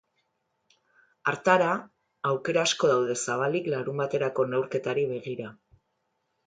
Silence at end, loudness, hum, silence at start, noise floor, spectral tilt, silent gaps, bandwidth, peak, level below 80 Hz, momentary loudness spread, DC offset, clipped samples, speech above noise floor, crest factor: 0.95 s; -27 LUFS; none; 1.25 s; -77 dBFS; -4 dB/octave; none; 9.6 kHz; -6 dBFS; -74 dBFS; 10 LU; under 0.1%; under 0.1%; 50 dB; 22 dB